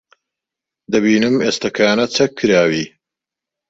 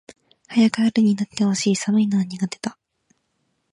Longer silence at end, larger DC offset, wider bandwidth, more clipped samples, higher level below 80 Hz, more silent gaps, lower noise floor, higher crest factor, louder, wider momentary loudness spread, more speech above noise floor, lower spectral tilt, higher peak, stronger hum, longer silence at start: second, 0.8 s vs 1 s; neither; second, 8 kHz vs 11 kHz; neither; first, -56 dBFS vs -66 dBFS; neither; first, -85 dBFS vs -71 dBFS; about the same, 16 dB vs 16 dB; first, -15 LUFS vs -20 LUFS; second, 6 LU vs 9 LU; first, 70 dB vs 52 dB; about the same, -4.5 dB/octave vs -5 dB/octave; about the same, -2 dBFS vs -4 dBFS; neither; first, 0.9 s vs 0.5 s